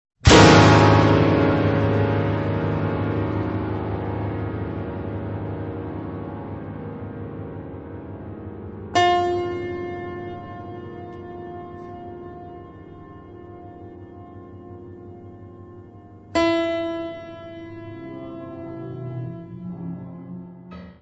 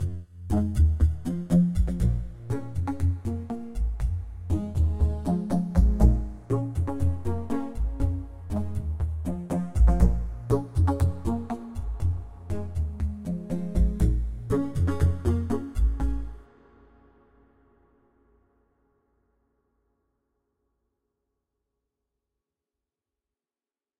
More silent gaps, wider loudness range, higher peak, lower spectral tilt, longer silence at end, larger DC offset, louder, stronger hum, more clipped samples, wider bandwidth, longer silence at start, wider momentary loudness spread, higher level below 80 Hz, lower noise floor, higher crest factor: neither; first, 19 LU vs 4 LU; first, 0 dBFS vs -6 dBFS; second, -6 dB/octave vs -9 dB/octave; second, 0.1 s vs 7.55 s; neither; first, -20 LUFS vs -28 LUFS; neither; neither; second, 8.4 kHz vs 12 kHz; first, 0.25 s vs 0 s; first, 24 LU vs 10 LU; second, -38 dBFS vs -30 dBFS; second, -44 dBFS vs under -90 dBFS; about the same, 22 dB vs 20 dB